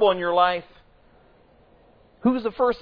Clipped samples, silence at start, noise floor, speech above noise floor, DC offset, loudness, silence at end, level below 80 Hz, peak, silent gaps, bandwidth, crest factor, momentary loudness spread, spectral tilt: under 0.1%; 0 s; -56 dBFS; 34 dB; under 0.1%; -23 LUFS; 0 s; -56 dBFS; -6 dBFS; none; 5.2 kHz; 18 dB; 5 LU; -8 dB/octave